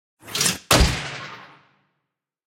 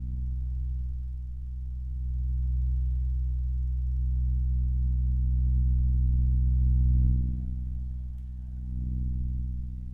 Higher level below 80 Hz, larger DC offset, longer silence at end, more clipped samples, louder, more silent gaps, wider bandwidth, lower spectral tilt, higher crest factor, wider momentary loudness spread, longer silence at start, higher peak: about the same, -30 dBFS vs -28 dBFS; neither; first, 1 s vs 0 s; neither; first, -20 LUFS vs -30 LUFS; neither; first, 17 kHz vs 0.5 kHz; second, -3 dB/octave vs -11.5 dB/octave; first, 24 dB vs 14 dB; first, 20 LU vs 12 LU; first, 0.25 s vs 0 s; first, 0 dBFS vs -14 dBFS